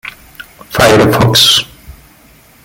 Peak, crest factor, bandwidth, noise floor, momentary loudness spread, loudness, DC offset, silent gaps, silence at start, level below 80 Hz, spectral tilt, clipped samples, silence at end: 0 dBFS; 12 dB; 17.5 kHz; -43 dBFS; 19 LU; -8 LUFS; under 0.1%; none; 0.05 s; -36 dBFS; -3.5 dB/octave; under 0.1%; 0.75 s